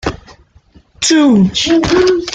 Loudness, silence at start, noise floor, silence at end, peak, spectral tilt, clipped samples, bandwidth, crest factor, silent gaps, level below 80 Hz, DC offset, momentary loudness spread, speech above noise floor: -11 LUFS; 0.05 s; -46 dBFS; 0 s; 0 dBFS; -4.5 dB/octave; under 0.1%; 9.6 kHz; 12 dB; none; -36 dBFS; under 0.1%; 6 LU; 36 dB